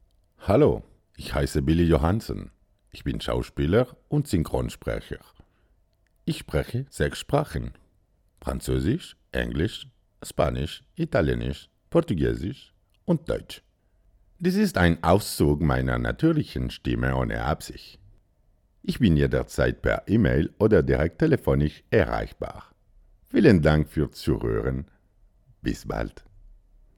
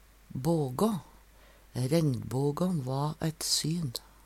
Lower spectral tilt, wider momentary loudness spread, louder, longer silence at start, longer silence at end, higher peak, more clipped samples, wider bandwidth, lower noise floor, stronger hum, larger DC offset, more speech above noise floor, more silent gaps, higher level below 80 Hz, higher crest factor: first, -7 dB/octave vs -5.5 dB/octave; first, 15 LU vs 9 LU; first, -25 LUFS vs -31 LUFS; about the same, 0.4 s vs 0.3 s; first, 0.9 s vs 0.25 s; first, -4 dBFS vs -12 dBFS; neither; about the same, 17.5 kHz vs 16.5 kHz; first, -65 dBFS vs -57 dBFS; neither; neither; first, 41 dB vs 27 dB; neither; first, -36 dBFS vs -58 dBFS; about the same, 22 dB vs 18 dB